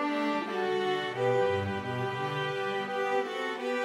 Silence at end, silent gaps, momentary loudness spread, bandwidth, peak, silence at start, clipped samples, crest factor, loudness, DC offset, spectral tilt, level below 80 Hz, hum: 0 s; none; 5 LU; 13.5 kHz; -16 dBFS; 0 s; under 0.1%; 14 dB; -31 LUFS; under 0.1%; -5.5 dB/octave; -72 dBFS; none